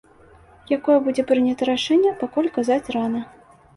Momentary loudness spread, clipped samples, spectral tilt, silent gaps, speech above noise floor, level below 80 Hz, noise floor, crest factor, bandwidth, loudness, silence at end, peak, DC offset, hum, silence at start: 8 LU; under 0.1%; -5 dB/octave; none; 30 dB; -58 dBFS; -50 dBFS; 16 dB; 11.5 kHz; -21 LUFS; 0.5 s; -6 dBFS; under 0.1%; none; 0.7 s